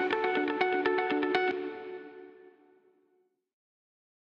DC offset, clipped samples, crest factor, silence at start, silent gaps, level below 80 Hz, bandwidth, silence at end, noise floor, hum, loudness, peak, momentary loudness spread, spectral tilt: under 0.1%; under 0.1%; 22 dB; 0 s; none; -78 dBFS; 6.8 kHz; 1.75 s; -73 dBFS; none; -29 LUFS; -12 dBFS; 17 LU; -5.5 dB/octave